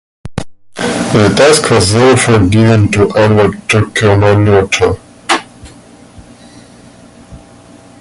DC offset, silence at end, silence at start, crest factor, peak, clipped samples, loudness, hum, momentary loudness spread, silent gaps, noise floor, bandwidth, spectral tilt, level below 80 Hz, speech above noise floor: under 0.1%; 0.65 s; 0.25 s; 10 dB; 0 dBFS; under 0.1%; -9 LUFS; 60 Hz at -35 dBFS; 14 LU; none; -38 dBFS; 11.5 kHz; -5 dB/octave; -32 dBFS; 29 dB